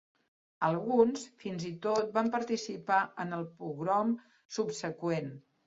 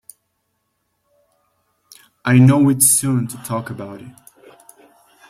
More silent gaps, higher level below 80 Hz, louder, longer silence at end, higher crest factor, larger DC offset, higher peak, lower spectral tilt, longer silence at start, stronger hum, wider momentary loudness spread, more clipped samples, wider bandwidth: first, 4.45-4.49 s vs none; second, -76 dBFS vs -56 dBFS; second, -33 LUFS vs -15 LUFS; second, 0.3 s vs 1.2 s; about the same, 20 dB vs 18 dB; neither; second, -12 dBFS vs -2 dBFS; about the same, -5.5 dB/octave vs -5 dB/octave; second, 0.6 s vs 2.25 s; neither; second, 11 LU vs 20 LU; neither; second, 7.8 kHz vs 16.5 kHz